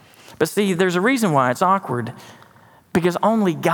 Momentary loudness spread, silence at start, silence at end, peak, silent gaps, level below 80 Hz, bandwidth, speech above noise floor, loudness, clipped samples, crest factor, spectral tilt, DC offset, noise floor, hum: 8 LU; 0.3 s; 0 s; -2 dBFS; none; -62 dBFS; 18.5 kHz; 32 dB; -19 LUFS; under 0.1%; 18 dB; -5.5 dB/octave; under 0.1%; -50 dBFS; none